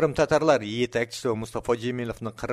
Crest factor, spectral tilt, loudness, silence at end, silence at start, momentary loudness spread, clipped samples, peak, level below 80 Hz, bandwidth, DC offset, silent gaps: 18 dB; -5.5 dB/octave; -26 LUFS; 0 s; 0 s; 10 LU; under 0.1%; -6 dBFS; -50 dBFS; 14.5 kHz; under 0.1%; none